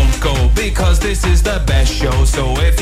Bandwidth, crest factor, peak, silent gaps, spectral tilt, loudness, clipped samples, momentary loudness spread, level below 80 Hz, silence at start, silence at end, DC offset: 15.5 kHz; 10 dB; -2 dBFS; none; -4.5 dB/octave; -15 LUFS; under 0.1%; 1 LU; -14 dBFS; 0 s; 0 s; under 0.1%